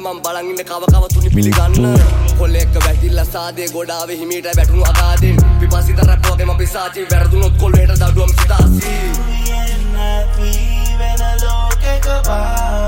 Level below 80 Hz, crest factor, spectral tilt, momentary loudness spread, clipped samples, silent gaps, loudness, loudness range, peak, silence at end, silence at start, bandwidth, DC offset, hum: -14 dBFS; 10 dB; -5.5 dB/octave; 9 LU; under 0.1%; none; -14 LUFS; 5 LU; 0 dBFS; 0 s; 0 s; 17 kHz; under 0.1%; none